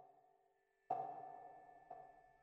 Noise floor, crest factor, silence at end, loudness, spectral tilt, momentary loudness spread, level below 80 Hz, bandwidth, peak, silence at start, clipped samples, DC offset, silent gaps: -80 dBFS; 24 dB; 0 s; -51 LUFS; -5.5 dB/octave; 17 LU; -88 dBFS; 6.2 kHz; -30 dBFS; 0 s; under 0.1%; under 0.1%; none